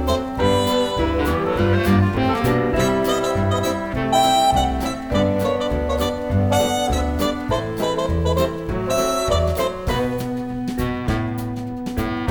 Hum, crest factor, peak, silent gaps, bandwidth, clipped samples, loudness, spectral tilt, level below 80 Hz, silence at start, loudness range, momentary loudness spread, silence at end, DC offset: none; 14 dB; -4 dBFS; none; over 20 kHz; under 0.1%; -20 LUFS; -5.5 dB/octave; -30 dBFS; 0 s; 3 LU; 7 LU; 0 s; under 0.1%